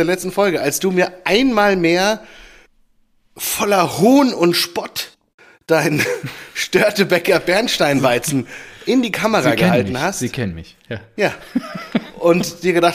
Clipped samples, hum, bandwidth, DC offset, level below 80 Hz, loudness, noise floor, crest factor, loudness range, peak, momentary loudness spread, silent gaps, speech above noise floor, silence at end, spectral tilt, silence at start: under 0.1%; none; 15.5 kHz; under 0.1%; -48 dBFS; -17 LUFS; -57 dBFS; 16 dB; 3 LU; -2 dBFS; 12 LU; 5.34-5.38 s; 41 dB; 0 s; -4.5 dB/octave; 0 s